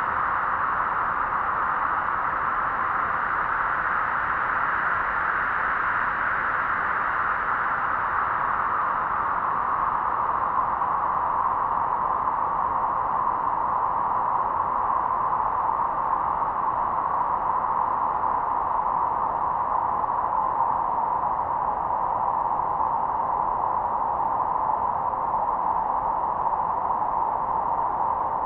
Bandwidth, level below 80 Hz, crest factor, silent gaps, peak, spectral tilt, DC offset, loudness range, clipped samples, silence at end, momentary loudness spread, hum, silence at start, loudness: 4.9 kHz; -50 dBFS; 14 dB; none; -12 dBFS; -8 dB/octave; under 0.1%; 1 LU; under 0.1%; 0 s; 1 LU; none; 0 s; -24 LUFS